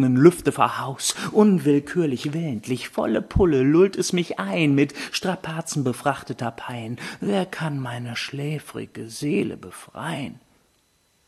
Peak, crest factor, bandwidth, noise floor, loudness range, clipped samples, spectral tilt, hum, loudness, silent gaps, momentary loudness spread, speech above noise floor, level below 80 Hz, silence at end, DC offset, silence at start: -2 dBFS; 20 dB; 13 kHz; -65 dBFS; 8 LU; under 0.1%; -5.5 dB/octave; none; -23 LUFS; none; 14 LU; 42 dB; -44 dBFS; 0.95 s; under 0.1%; 0 s